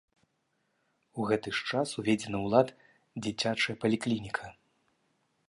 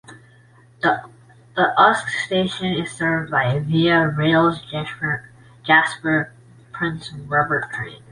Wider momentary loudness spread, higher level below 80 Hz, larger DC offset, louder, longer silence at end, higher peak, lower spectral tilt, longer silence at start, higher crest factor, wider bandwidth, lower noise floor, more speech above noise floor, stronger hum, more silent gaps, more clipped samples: about the same, 11 LU vs 13 LU; second, -66 dBFS vs -54 dBFS; neither; second, -31 LUFS vs -20 LUFS; first, 0.95 s vs 0.15 s; second, -10 dBFS vs -2 dBFS; about the same, -5 dB/octave vs -5.5 dB/octave; first, 1.15 s vs 0.1 s; about the same, 22 dB vs 20 dB; about the same, 11.5 kHz vs 11.5 kHz; first, -77 dBFS vs -50 dBFS; first, 47 dB vs 31 dB; neither; neither; neither